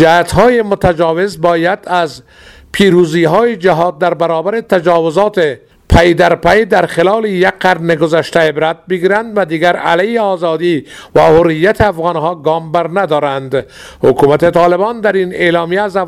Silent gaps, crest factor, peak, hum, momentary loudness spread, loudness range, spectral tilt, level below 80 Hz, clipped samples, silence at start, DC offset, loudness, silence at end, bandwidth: none; 10 dB; 0 dBFS; none; 7 LU; 2 LU; -6 dB/octave; -32 dBFS; 0.4%; 0 s; under 0.1%; -11 LUFS; 0 s; 14.5 kHz